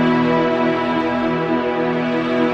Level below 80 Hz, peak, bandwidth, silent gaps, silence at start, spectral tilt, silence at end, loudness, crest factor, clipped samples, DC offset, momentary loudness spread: -52 dBFS; -6 dBFS; 7.6 kHz; none; 0 s; -7.5 dB/octave; 0 s; -18 LUFS; 12 dB; under 0.1%; under 0.1%; 3 LU